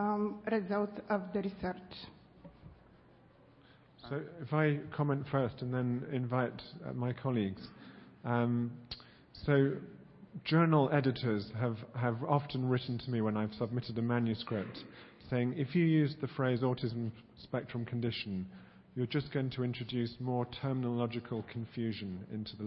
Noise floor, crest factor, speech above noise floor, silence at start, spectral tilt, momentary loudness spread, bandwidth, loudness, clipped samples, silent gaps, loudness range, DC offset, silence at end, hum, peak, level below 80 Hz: -62 dBFS; 20 dB; 28 dB; 0 s; -6.5 dB/octave; 16 LU; 5.6 kHz; -35 LUFS; under 0.1%; none; 6 LU; under 0.1%; 0 s; none; -14 dBFS; -66 dBFS